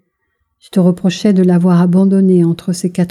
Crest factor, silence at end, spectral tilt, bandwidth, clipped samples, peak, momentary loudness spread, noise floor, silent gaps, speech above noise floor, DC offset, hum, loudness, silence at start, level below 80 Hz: 10 dB; 0 s; -7.5 dB/octave; 12 kHz; under 0.1%; -2 dBFS; 7 LU; -67 dBFS; none; 56 dB; under 0.1%; none; -12 LUFS; 0.75 s; -58 dBFS